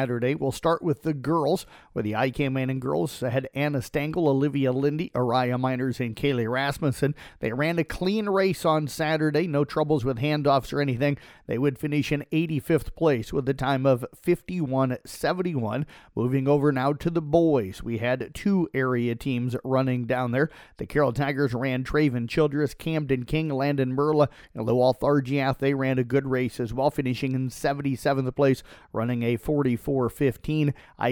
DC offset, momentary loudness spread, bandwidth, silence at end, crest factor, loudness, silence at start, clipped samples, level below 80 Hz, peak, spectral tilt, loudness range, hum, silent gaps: under 0.1%; 5 LU; 18 kHz; 0 s; 18 dB; -25 LUFS; 0 s; under 0.1%; -50 dBFS; -8 dBFS; -7 dB/octave; 2 LU; none; none